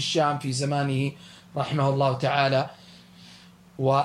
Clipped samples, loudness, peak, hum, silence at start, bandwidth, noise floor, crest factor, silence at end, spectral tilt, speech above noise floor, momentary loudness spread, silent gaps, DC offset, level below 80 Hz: under 0.1%; -25 LUFS; -8 dBFS; none; 0 s; 11.5 kHz; -50 dBFS; 18 dB; 0 s; -5.5 dB/octave; 26 dB; 10 LU; none; under 0.1%; -66 dBFS